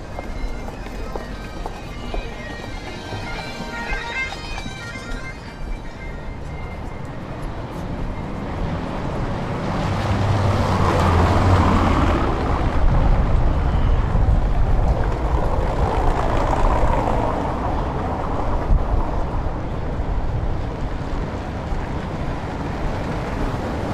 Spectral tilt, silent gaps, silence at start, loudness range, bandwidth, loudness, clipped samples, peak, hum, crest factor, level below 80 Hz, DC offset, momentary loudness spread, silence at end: -7 dB/octave; none; 0 s; 12 LU; 11.5 kHz; -23 LUFS; under 0.1%; -4 dBFS; none; 16 dB; -24 dBFS; under 0.1%; 13 LU; 0 s